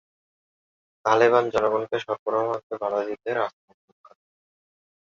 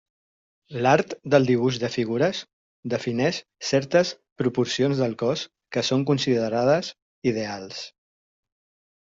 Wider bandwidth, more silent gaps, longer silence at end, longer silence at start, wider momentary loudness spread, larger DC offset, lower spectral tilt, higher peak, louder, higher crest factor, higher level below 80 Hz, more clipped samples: about the same, 7.2 kHz vs 7.8 kHz; second, 2.19-2.26 s, 2.63-2.70 s vs 2.53-2.83 s, 4.32-4.36 s, 7.02-7.22 s; first, 1.65 s vs 1.25 s; first, 1.05 s vs 0.7 s; about the same, 10 LU vs 12 LU; neither; about the same, -5 dB/octave vs -5.5 dB/octave; about the same, -4 dBFS vs -6 dBFS; about the same, -24 LUFS vs -24 LUFS; about the same, 22 dB vs 20 dB; about the same, -68 dBFS vs -64 dBFS; neither